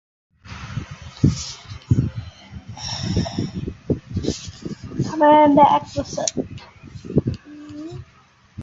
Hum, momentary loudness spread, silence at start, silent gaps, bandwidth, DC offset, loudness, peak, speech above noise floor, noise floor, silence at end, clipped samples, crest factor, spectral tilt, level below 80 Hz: none; 24 LU; 0.45 s; none; 8 kHz; under 0.1%; -20 LUFS; -2 dBFS; 37 dB; -53 dBFS; 0 s; under 0.1%; 20 dB; -6 dB/octave; -38 dBFS